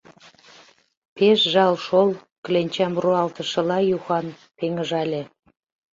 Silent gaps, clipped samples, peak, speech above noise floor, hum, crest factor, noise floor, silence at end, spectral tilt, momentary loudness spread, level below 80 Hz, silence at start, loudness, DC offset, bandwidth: 2.32-2.43 s; under 0.1%; -4 dBFS; 33 dB; none; 18 dB; -54 dBFS; 0.65 s; -5.5 dB/octave; 12 LU; -68 dBFS; 1.15 s; -21 LUFS; under 0.1%; 7.6 kHz